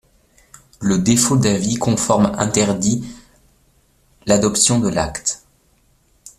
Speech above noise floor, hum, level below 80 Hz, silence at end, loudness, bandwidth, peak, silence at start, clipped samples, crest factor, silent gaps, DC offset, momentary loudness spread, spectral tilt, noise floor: 42 dB; none; -44 dBFS; 0.1 s; -17 LUFS; 14 kHz; 0 dBFS; 0.8 s; under 0.1%; 20 dB; none; under 0.1%; 11 LU; -4.5 dB/octave; -58 dBFS